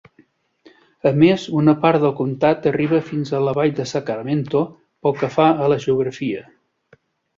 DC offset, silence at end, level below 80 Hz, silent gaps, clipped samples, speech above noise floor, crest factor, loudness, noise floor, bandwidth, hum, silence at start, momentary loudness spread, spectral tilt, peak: under 0.1%; 0.95 s; -58 dBFS; none; under 0.1%; 39 dB; 18 dB; -19 LUFS; -57 dBFS; 7.6 kHz; none; 1.05 s; 9 LU; -7.5 dB/octave; -2 dBFS